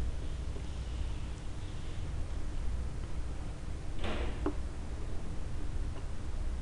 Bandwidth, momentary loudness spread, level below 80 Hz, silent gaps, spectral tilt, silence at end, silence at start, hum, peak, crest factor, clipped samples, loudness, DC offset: 11 kHz; 5 LU; -38 dBFS; none; -6 dB/octave; 0 s; 0 s; none; -20 dBFS; 14 dB; under 0.1%; -41 LUFS; under 0.1%